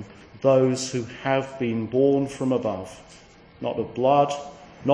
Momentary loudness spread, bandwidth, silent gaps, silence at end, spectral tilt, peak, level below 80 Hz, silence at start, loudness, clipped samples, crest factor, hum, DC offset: 14 LU; 10.5 kHz; none; 0 s; -6 dB/octave; -6 dBFS; -58 dBFS; 0 s; -24 LUFS; under 0.1%; 18 dB; none; under 0.1%